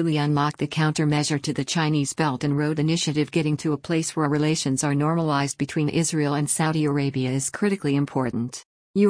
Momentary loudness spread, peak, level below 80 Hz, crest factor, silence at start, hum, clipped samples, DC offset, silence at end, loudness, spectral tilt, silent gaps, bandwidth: 3 LU; -8 dBFS; -58 dBFS; 14 dB; 0 s; none; under 0.1%; under 0.1%; 0 s; -23 LUFS; -5 dB/octave; 8.65-8.94 s; 10.5 kHz